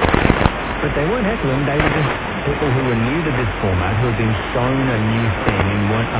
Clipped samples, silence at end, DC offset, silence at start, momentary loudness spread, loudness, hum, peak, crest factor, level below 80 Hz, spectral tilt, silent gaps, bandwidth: under 0.1%; 0 s; under 0.1%; 0 s; 3 LU; -18 LUFS; none; 0 dBFS; 18 dB; -28 dBFS; -10.5 dB/octave; none; 4 kHz